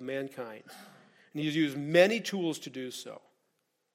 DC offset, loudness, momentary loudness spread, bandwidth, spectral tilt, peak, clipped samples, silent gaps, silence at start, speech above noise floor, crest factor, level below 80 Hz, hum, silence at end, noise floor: under 0.1%; -30 LUFS; 24 LU; 16 kHz; -5 dB/octave; -8 dBFS; under 0.1%; none; 0 s; 47 dB; 24 dB; -82 dBFS; none; 0.75 s; -78 dBFS